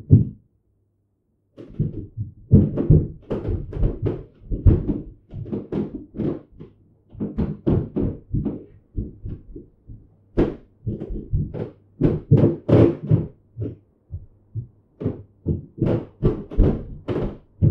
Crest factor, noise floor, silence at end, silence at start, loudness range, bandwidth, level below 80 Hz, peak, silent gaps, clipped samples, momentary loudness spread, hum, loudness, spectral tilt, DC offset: 22 dB; -69 dBFS; 0 s; 0.1 s; 7 LU; 4.4 kHz; -32 dBFS; 0 dBFS; none; under 0.1%; 19 LU; none; -23 LUFS; -12 dB/octave; under 0.1%